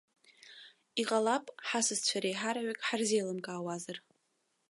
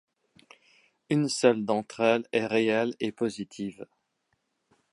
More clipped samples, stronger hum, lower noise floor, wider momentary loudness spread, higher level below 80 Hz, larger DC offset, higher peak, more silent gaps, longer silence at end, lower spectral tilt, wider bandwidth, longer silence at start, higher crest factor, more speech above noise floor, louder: neither; neither; about the same, -79 dBFS vs -76 dBFS; first, 19 LU vs 13 LU; second, -88 dBFS vs -74 dBFS; neither; second, -18 dBFS vs -6 dBFS; neither; second, 0.7 s vs 1.1 s; second, -2.5 dB/octave vs -5 dB/octave; about the same, 11.5 kHz vs 11.5 kHz; second, 0.45 s vs 1.1 s; about the same, 18 dB vs 22 dB; second, 45 dB vs 50 dB; second, -33 LUFS vs -27 LUFS